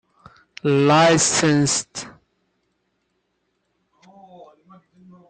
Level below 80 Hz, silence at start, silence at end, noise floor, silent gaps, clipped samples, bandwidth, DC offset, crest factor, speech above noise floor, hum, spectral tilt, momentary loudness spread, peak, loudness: -58 dBFS; 0.65 s; 3.2 s; -72 dBFS; none; under 0.1%; 9.8 kHz; under 0.1%; 18 dB; 55 dB; none; -4 dB/octave; 19 LU; -4 dBFS; -17 LUFS